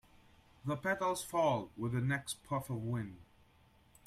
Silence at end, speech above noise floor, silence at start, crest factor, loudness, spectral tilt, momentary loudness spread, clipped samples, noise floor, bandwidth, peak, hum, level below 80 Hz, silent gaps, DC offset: 0.8 s; 30 dB; 0.65 s; 18 dB; -37 LUFS; -5.5 dB/octave; 8 LU; under 0.1%; -67 dBFS; 15.5 kHz; -20 dBFS; none; -66 dBFS; none; under 0.1%